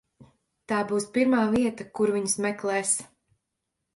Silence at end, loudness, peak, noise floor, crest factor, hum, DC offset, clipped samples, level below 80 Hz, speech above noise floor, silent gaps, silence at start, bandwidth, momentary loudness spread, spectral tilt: 0.9 s; -26 LUFS; -12 dBFS; -82 dBFS; 16 dB; none; under 0.1%; under 0.1%; -62 dBFS; 57 dB; none; 0.2 s; 11.5 kHz; 6 LU; -4 dB/octave